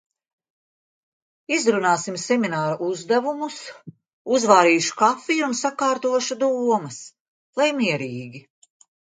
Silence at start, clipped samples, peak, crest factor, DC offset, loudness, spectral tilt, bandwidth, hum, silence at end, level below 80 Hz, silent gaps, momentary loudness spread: 1.5 s; under 0.1%; 0 dBFS; 22 dB; under 0.1%; -21 LUFS; -3.5 dB/octave; 9.6 kHz; none; 0.8 s; -74 dBFS; 4.13-4.25 s, 7.20-7.53 s; 17 LU